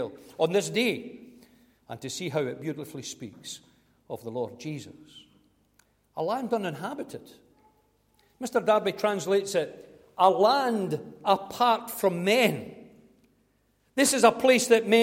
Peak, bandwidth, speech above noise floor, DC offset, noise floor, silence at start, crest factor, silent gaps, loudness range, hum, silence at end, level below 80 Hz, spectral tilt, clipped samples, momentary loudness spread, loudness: -6 dBFS; 16.5 kHz; 43 dB; under 0.1%; -69 dBFS; 0 s; 22 dB; none; 12 LU; 50 Hz at -65 dBFS; 0 s; -70 dBFS; -3.5 dB/octave; under 0.1%; 20 LU; -26 LUFS